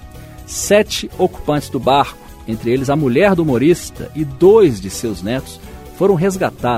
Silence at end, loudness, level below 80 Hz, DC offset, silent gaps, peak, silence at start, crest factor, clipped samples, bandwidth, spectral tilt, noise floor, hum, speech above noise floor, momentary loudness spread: 0 s; -15 LUFS; -38 dBFS; under 0.1%; none; 0 dBFS; 0 s; 16 dB; under 0.1%; 16 kHz; -5.5 dB/octave; -34 dBFS; none; 20 dB; 15 LU